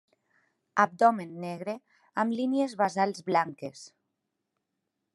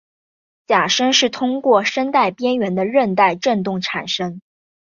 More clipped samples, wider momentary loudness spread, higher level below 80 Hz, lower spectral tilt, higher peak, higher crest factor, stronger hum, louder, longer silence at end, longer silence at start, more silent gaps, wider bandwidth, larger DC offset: neither; first, 16 LU vs 7 LU; second, -86 dBFS vs -64 dBFS; first, -5.5 dB/octave vs -3.5 dB/octave; second, -8 dBFS vs -2 dBFS; first, 24 dB vs 16 dB; neither; second, -28 LUFS vs -17 LUFS; first, 1.3 s vs 0.45 s; about the same, 0.75 s vs 0.7 s; neither; first, 12 kHz vs 7.4 kHz; neither